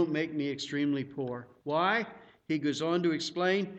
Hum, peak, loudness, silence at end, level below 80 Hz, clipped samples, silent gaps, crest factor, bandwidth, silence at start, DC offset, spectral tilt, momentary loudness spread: none; -14 dBFS; -31 LUFS; 0 s; -74 dBFS; under 0.1%; none; 16 dB; 8.6 kHz; 0 s; under 0.1%; -5.5 dB/octave; 9 LU